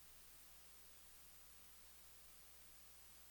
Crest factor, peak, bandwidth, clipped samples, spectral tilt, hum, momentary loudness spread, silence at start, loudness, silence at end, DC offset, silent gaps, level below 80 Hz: 12 dB; -50 dBFS; over 20 kHz; under 0.1%; -1 dB/octave; 60 Hz at -75 dBFS; 0 LU; 0 s; -60 LUFS; 0 s; under 0.1%; none; -76 dBFS